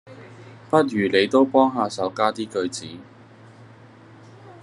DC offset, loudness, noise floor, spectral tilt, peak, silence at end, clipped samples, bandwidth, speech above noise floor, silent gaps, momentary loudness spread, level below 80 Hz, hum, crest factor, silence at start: under 0.1%; -21 LUFS; -47 dBFS; -5 dB/octave; -2 dBFS; 0.1 s; under 0.1%; 11.5 kHz; 26 dB; none; 18 LU; -70 dBFS; none; 22 dB; 0.05 s